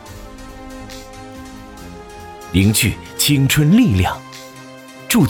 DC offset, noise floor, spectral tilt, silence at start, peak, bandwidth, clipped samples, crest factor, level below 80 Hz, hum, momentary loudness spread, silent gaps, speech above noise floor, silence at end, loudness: under 0.1%; -37 dBFS; -4.5 dB/octave; 0.05 s; -4 dBFS; over 20 kHz; under 0.1%; 14 dB; -38 dBFS; none; 23 LU; none; 23 dB; 0 s; -15 LUFS